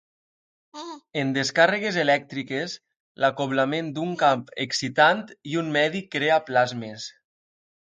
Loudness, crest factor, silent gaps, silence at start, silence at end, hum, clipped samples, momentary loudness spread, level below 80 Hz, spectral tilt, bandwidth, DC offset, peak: -23 LUFS; 20 dB; 3.00-3.15 s; 0.75 s; 0.85 s; none; under 0.1%; 15 LU; -72 dBFS; -4.5 dB/octave; 9.4 kHz; under 0.1%; -4 dBFS